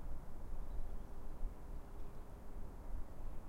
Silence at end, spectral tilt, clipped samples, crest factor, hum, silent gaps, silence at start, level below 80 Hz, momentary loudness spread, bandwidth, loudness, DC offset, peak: 0 s; -7 dB/octave; under 0.1%; 12 dB; none; none; 0 s; -46 dBFS; 4 LU; 2.9 kHz; -53 LUFS; under 0.1%; -28 dBFS